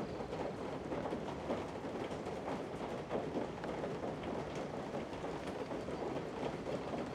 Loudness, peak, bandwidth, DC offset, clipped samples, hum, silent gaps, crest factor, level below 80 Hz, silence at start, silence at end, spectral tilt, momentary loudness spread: -42 LUFS; -26 dBFS; 15 kHz; under 0.1%; under 0.1%; none; none; 16 dB; -60 dBFS; 0 s; 0 s; -6.5 dB/octave; 2 LU